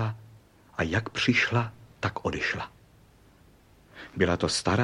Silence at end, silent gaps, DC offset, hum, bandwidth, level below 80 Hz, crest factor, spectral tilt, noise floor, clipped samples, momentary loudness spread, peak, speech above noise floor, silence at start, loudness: 0 s; none; under 0.1%; none; 12 kHz; -52 dBFS; 20 dB; -4.5 dB/octave; -57 dBFS; under 0.1%; 17 LU; -10 dBFS; 30 dB; 0 s; -28 LUFS